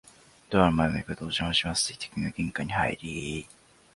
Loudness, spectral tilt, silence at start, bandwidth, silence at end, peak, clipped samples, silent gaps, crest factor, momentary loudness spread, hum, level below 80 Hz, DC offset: -28 LUFS; -4 dB/octave; 0.5 s; 11.5 kHz; 0.5 s; -6 dBFS; under 0.1%; none; 24 dB; 11 LU; none; -48 dBFS; under 0.1%